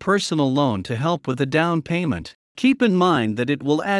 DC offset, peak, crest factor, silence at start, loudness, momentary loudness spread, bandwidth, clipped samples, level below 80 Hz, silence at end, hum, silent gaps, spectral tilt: under 0.1%; -4 dBFS; 16 dB; 0 s; -21 LUFS; 6 LU; 12 kHz; under 0.1%; -56 dBFS; 0 s; none; 2.35-2.55 s; -6 dB/octave